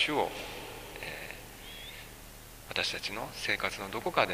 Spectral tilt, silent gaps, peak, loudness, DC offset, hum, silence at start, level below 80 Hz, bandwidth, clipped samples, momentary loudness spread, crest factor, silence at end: -3 dB/octave; none; -8 dBFS; -35 LUFS; under 0.1%; none; 0 s; -54 dBFS; 15.5 kHz; under 0.1%; 15 LU; 28 dB; 0 s